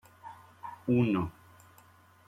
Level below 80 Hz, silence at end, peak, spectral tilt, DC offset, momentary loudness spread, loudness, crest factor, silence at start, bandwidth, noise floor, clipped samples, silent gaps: -62 dBFS; 0.95 s; -16 dBFS; -8.5 dB/octave; under 0.1%; 23 LU; -30 LUFS; 18 dB; 0.25 s; 15.5 kHz; -59 dBFS; under 0.1%; none